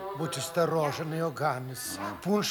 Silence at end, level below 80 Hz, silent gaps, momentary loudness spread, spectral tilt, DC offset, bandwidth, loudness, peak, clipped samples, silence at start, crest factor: 0 s; -68 dBFS; none; 7 LU; -4.5 dB/octave; under 0.1%; over 20 kHz; -31 LUFS; -14 dBFS; under 0.1%; 0 s; 16 dB